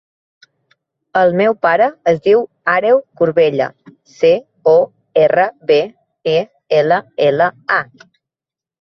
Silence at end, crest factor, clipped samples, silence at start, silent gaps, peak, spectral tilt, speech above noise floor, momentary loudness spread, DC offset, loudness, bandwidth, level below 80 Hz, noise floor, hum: 1 s; 14 dB; under 0.1%; 1.15 s; none; 0 dBFS; -6.5 dB/octave; 75 dB; 5 LU; under 0.1%; -14 LUFS; 6.4 kHz; -60 dBFS; -89 dBFS; none